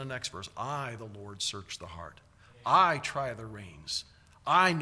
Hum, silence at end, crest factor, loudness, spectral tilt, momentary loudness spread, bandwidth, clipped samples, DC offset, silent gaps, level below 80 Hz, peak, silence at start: none; 0 s; 22 dB; -30 LUFS; -3.5 dB/octave; 20 LU; 11 kHz; under 0.1%; under 0.1%; none; -62 dBFS; -10 dBFS; 0 s